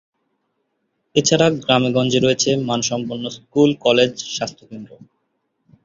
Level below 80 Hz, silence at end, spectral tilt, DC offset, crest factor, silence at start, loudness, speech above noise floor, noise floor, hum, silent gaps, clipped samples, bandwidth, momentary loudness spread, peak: -56 dBFS; 0.9 s; -4 dB/octave; under 0.1%; 18 dB; 1.15 s; -18 LUFS; 53 dB; -71 dBFS; none; none; under 0.1%; 7.8 kHz; 13 LU; -2 dBFS